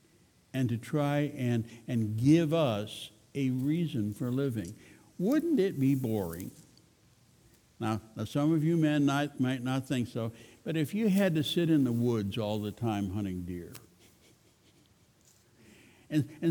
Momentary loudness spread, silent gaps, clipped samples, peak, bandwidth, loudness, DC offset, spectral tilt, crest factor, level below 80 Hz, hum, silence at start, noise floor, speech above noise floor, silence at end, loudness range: 12 LU; none; under 0.1%; -12 dBFS; over 20 kHz; -31 LUFS; under 0.1%; -7 dB/octave; 18 dB; -66 dBFS; none; 0.55 s; -64 dBFS; 34 dB; 0 s; 7 LU